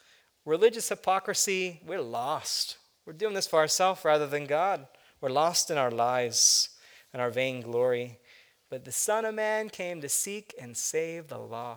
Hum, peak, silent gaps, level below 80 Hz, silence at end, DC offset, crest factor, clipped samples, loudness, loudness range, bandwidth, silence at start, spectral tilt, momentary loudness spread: none; -8 dBFS; none; -78 dBFS; 0 s; under 0.1%; 20 dB; under 0.1%; -28 LUFS; 5 LU; over 20 kHz; 0.45 s; -1.5 dB/octave; 13 LU